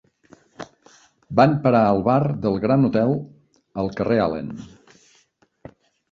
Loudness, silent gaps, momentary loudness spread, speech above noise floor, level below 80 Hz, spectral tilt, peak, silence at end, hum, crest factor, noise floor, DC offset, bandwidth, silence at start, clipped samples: -20 LUFS; none; 23 LU; 42 dB; -52 dBFS; -9 dB/octave; -2 dBFS; 1.45 s; none; 20 dB; -62 dBFS; under 0.1%; 7.4 kHz; 0.6 s; under 0.1%